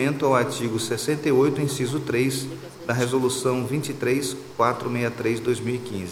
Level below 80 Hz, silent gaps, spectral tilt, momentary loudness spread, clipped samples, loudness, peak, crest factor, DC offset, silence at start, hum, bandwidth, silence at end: -60 dBFS; none; -5 dB/octave; 8 LU; under 0.1%; -24 LUFS; -4 dBFS; 18 dB; under 0.1%; 0 s; none; 16.5 kHz; 0 s